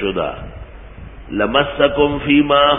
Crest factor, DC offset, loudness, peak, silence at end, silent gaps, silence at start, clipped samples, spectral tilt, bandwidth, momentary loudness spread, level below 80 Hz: 16 dB; under 0.1%; -16 LUFS; 0 dBFS; 0 s; none; 0 s; under 0.1%; -10.5 dB/octave; 3.8 kHz; 20 LU; -36 dBFS